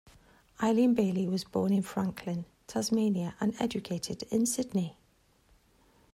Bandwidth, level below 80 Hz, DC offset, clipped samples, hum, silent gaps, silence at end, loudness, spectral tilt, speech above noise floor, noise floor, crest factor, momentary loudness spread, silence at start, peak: 15.5 kHz; -64 dBFS; under 0.1%; under 0.1%; none; none; 1.2 s; -31 LUFS; -5.5 dB/octave; 37 dB; -67 dBFS; 16 dB; 10 LU; 0.6 s; -16 dBFS